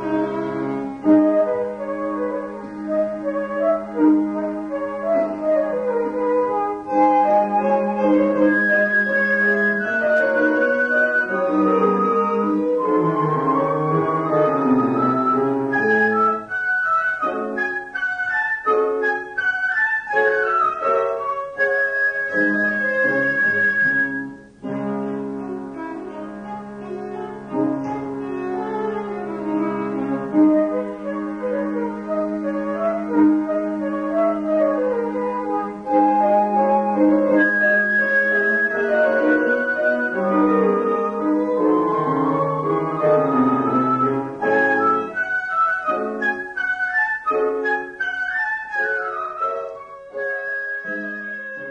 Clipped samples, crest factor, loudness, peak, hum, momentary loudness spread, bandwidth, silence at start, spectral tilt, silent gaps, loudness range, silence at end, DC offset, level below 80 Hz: under 0.1%; 14 dB; -20 LUFS; -6 dBFS; none; 10 LU; 7 kHz; 0 s; -8 dB/octave; none; 6 LU; 0 s; under 0.1%; -58 dBFS